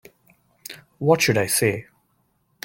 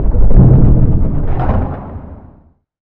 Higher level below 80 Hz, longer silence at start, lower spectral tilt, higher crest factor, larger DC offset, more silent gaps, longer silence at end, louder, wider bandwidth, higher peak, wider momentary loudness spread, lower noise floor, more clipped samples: second, -60 dBFS vs -14 dBFS; first, 0.7 s vs 0 s; second, -4 dB/octave vs -13.5 dB/octave; first, 20 dB vs 10 dB; neither; neither; first, 0.85 s vs 0 s; second, -20 LUFS vs -12 LUFS; first, 17 kHz vs 2.6 kHz; second, -4 dBFS vs 0 dBFS; about the same, 21 LU vs 19 LU; first, -67 dBFS vs -46 dBFS; second, under 0.1% vs 0.6%